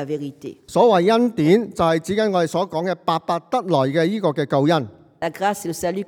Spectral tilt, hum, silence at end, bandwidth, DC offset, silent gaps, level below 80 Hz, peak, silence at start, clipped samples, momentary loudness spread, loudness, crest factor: -6 dB/octave; none; 0.05 s; 18.5 kHz; under 0.1%; none; -58 dBFS; -2 dBFS; 0 s; under 0.1%; 12 LU; -20 LUFS; 16 dB